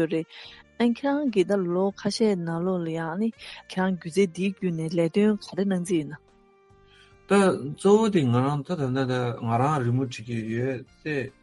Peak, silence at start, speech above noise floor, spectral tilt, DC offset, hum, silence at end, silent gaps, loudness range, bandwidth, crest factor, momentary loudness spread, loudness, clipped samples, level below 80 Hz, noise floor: -8 dBFS; 0 s; 33 dB; -6.5 dB/octave; under 0.1%; none; 0.15 s; none; 3 LU; 11.5 kHz; 16 dB; 10 LU; -25 LUFS; under 0.1%; -62 dBFS; -58 dBFS